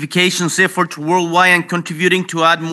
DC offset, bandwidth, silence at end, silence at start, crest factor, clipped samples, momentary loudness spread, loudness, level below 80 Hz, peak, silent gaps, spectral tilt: under 0.1%; 12.5 kHz; 0 s; 0 s; 14 dB; under 0.1%; 6 LU; -14 LUFS; -72 dBFS; 0 dBFS; none; -3.5 dB/octave